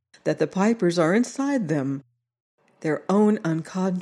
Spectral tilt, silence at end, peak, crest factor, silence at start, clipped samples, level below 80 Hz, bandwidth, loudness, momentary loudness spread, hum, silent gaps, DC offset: -6.5 dB/octave; 0 s; -8 dBFS; 16 dB; 0.25 s; under 0.1%; -74 dBFS; 11.5 kHz; -23 LUFS; 8 LU; none; 2.40-2.58 s; under 0.1%